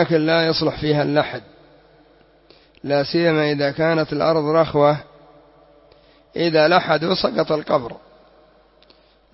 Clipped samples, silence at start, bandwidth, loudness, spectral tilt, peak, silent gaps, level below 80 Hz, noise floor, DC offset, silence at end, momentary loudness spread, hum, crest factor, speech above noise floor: under 0.1%; 0 s; 6 kHz; -19 LUFS; -9 dB/octave; -2 dBFS; none; -52 dBFS; -54 dBFS; under 0.1%; 1.35 s; 9 LU; none; 18 dB; 36 dB